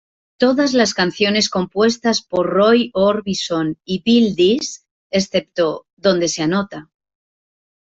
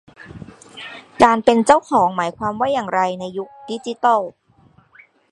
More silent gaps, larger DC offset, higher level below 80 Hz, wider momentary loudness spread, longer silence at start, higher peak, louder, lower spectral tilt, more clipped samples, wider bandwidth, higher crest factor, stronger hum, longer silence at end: first, 4.91-5.10 s, 5.93-5.97 s vs none; neither; about the same, -56 dBFS vs -54 dBFS; second, 8 LU vs 22 LU; first, 0.4 s vs 0.2 s; about the same, -2 dBFS vs 0 dBFS; about the same, -17 LUFS vs -17 LUFS; about the same, -4.5 dB/octave vs -5 dB/octave; neither; second, 8 kHz vs 11.5 kHz; second, 14 dB vs 20 dB; neither; about the same, 0.95 s vs 1 s